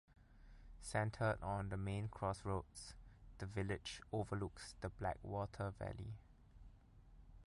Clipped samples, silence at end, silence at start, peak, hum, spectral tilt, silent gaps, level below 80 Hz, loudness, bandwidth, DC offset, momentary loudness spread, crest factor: under 0.1%; 0.05 s; 0.1 s; -24 dBFS; none; -6 dB/octave; none; -58 dBFS; -45 LUFS; 11.5 kHz; under 0.1%; 23 LU; 20 dB